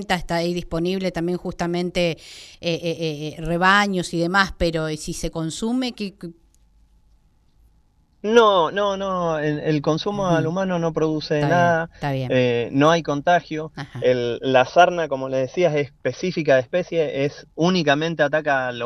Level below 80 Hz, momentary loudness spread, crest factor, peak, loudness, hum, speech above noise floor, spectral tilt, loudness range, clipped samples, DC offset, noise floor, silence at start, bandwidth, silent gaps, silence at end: -44 dBFS; 10 LU; 18 dB; -2 dBFS; -21 LUFS; none; 38 dB; -5.5 dB/octave; 5 LU; under 0.1%; under 0.1%; -59 dBFS; 0 s; 13 kHz; none; 0 s